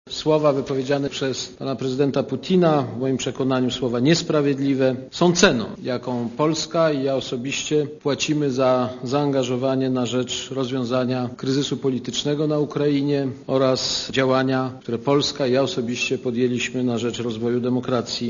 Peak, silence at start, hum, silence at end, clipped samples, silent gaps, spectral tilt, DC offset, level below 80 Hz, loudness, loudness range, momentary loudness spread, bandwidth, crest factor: 0 dBFS; 0.05 s; none; 0 s; under 0.1%; none; -5 dB/octave; under 0.1%; -56 dBFS; -22 LUFS; 3 LU; 7 LU; 7.4 kHz; 22 dB